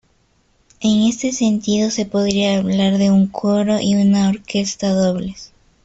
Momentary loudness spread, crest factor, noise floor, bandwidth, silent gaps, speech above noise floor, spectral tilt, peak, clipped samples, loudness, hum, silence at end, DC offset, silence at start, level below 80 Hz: 6 LU; 14 dB; -59 dBFS; 8 kHz; none; 43 dB; -5.5 dB/octave; -4 dBFS; under 0.1%; -17 LUFS; none; 0.4 s; under 0.1%; 0.8 s; -50 dBFS